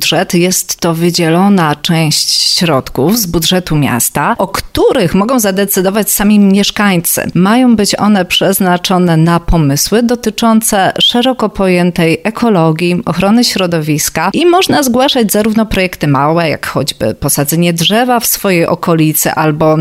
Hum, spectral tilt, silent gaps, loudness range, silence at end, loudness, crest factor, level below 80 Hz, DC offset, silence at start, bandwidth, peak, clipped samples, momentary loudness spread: none; -4.5 dB/octave; none; 2 LU; 0 s; -10 LUFS; 10 dB; -32 dBFS; under 0.1%; 0 s; 16.5 kHz; 0 dBFS; under 0.1%; 4 LU